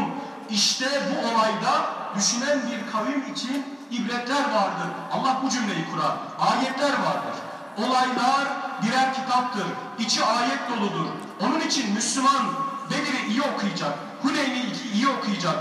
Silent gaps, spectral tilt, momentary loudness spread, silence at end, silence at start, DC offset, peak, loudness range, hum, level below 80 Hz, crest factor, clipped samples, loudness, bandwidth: none; -3 dB/octave; 8 LU; 0 s; 0 s; under 0.1%; -8 dBFS; 2 LU; none; -84 dBFS; 18 dB; under 0.1%; -24 LUFS; 14.5 kHz